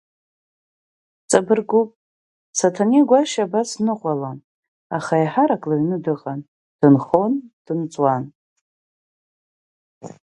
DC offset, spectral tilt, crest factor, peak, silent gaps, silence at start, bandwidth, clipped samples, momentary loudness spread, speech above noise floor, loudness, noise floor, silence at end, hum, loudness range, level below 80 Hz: under 0.1%; -6 dB/octave; 20 dB; 0 dBFS; 1.96-2.53 s, 4.44-4.90 s, 6.48-6.79 s, 7.53-7.65 s, 8.35-10.01 s; 1.3 s; 11.5 kHz; under 0.1%; 12 LU; over 72 dB; -19 LUFS; under -90 dBFS; 0.2 s; none; 3 LU; -66 dBFS